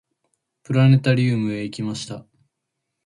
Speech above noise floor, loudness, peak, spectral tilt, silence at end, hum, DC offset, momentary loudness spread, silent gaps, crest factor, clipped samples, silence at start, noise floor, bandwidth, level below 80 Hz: 60 dB; -20 LUFS; -4 dBFS; -7 dB/octave; 0.85 s; none; under 0.1%; 16 LU; none; 16 dB; under 0.1%; 0.7 s; -79 dBFS; 11.5 kHz; -58 dBFS